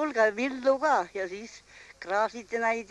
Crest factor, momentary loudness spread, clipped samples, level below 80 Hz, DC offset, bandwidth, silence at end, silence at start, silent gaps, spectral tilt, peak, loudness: 16 dB; 18 LU; under 0.1%; -68 dBFS; under 0.1%; 11.5 kHz; 0.05 s; 0 s; none; -3.5 dB/octave; -12 dBFS; -28 LUFS